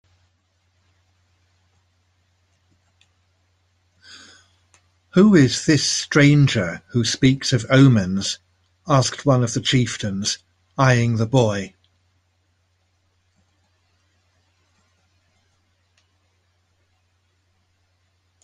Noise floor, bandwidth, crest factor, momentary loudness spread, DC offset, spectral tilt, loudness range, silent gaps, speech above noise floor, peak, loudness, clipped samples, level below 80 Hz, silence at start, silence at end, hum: -66 dBFS; 10.5 kHz; 20 dB; 11 LU; under 0.1%; -5 dB/octave; 6 LU; none; 49 dB; -2 dBFS; -18 LUFS; under 0.1%; -52 dBFS; 5.15 s; 6.75 s; none